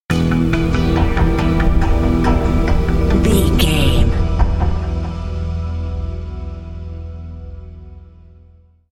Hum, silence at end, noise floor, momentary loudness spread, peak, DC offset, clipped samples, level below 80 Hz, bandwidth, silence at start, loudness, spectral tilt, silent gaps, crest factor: none; 0.8 s; -47 dBFS; 16 LU; 0 dBFS; under 0.1%; under 0.1%; -20 dBFS; 16 kHz; 0.1 s; -17 LUFS; -6.5 dB/octave; none; 16 dB